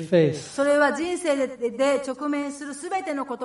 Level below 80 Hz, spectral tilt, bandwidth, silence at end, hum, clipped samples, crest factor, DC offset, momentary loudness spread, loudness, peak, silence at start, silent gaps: -66 dBFS; -5.5 dB/octave; 11.5 kHz; 0 s; none; under 0.1%; 18 dB; under 0.1%; 9 LU; -24 LUFS; -6 dBFS; 0 s; none